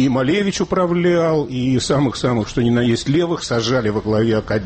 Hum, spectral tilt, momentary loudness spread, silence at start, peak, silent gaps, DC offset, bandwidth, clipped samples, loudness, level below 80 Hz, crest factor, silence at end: none; -6 dB/octave; 3 LU; 0 s; -8 dBFS; none; under 0.1%; 8.8 kHz; under 0.1%; -18 LUFS; -42 dBFS; 8 dB; 0 s